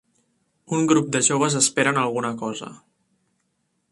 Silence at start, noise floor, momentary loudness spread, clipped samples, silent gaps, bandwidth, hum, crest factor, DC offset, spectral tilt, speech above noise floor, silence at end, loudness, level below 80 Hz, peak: 0.7 s; -72 dBFS; 12 LU; under 0.1%; none; 11.5 kHz; none; 20 dB; under 0.1%; -3.5 dB/octave; 51 dB; 1.15 s; -21 LUFS; -64 dBFS; -4 dBFS